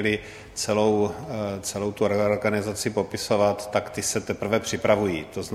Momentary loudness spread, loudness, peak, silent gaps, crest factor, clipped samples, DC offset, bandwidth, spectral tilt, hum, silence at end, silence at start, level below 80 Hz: 7 LU; -25 LUFS; -4 dBFS; none; 20 dB; under 0.1%; under 0.1%; 15.5 kHz; -4.5 dB/octave; none; 0 s; 0 s; -54 dBFS